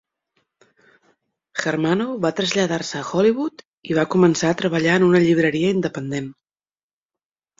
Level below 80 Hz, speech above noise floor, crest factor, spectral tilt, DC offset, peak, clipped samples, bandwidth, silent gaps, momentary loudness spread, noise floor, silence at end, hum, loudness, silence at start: -58 dBFS; over 71 dB; 18 dB; -5.5 dB/octave; under 0.1%; -2 dBFS; under 0.1%; 7.8 kHz; 3.67-3.73 s; 12 LU; under -90 dBFS; 1.25 s; none; -20 LUFS; 1.55 s